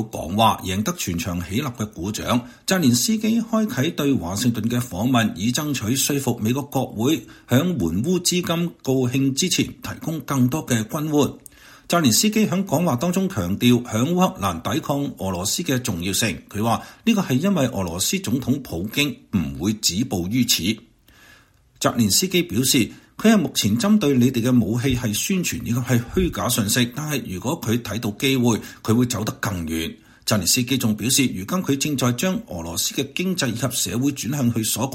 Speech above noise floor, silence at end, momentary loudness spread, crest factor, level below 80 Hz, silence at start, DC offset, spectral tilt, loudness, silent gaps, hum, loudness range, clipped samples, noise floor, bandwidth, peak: 32 dB; 0 s; 7 LU; 20 dB; -46 dBFS; 0 s; under 0.1%; -4.5 dB/octave; -21 LUFS; none; none; 3 LU; under 0.1%; -54 dBFS; 16.5 kHz; -2 dBFS